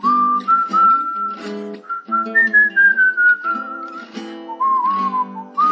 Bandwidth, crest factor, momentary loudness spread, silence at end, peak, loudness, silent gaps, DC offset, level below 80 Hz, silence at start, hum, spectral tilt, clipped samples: 7.8 kHz; 12 dB; 18 LU; 0 s; -4 dBFS; -15 LUFS; none; under 0.1%; under -90 dBFS; 0 s; none; -5 dB/octave; under 0.1%